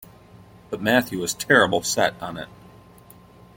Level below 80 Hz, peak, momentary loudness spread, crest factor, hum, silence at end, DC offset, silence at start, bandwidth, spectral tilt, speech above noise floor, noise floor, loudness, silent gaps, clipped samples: -56 dBFS; -2 dBFS; 18 LU; 22 dB; none; 1.1 s; under 0.1%; 0.7 s; 17 kHz; -3 dB/octave; 27 dB; -49 dBFS; -20 LUFS; none; under 0.1%